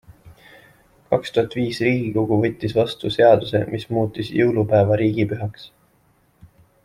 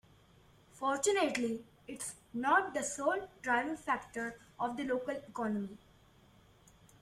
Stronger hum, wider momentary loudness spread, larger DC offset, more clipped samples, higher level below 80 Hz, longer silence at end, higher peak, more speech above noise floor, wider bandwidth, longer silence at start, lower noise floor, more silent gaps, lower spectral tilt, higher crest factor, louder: neither; second, 8 LU vs 12 LU; neither; neither; first, -52 dBFS vs -70 dBFS; about the same, 1.2 s vs 1.25 s; first, -2 dBFS vs -16 dBFS; first, 41 dB vs 29 dB; second, 13.5 kHz vs 15.5 kHz; second, 0.25 s vs 0.75 s; second, -60 dBFS vs -64 dBFS; neither; first, -7.5 dB/octave vs -3 dB/octave; about the same, 18 dB vs 22 dB; first, -20 LUFS vs -35 LUFS